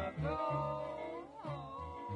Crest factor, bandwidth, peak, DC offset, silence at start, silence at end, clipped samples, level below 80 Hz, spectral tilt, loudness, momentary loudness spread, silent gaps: 14 dB; 10 kHz; -26 dBFS; under 0.1%; 0 s; 0 s; under 0.1%; -58 dBFS; -8 dB/octave; -41 LUFS; 9 LU; none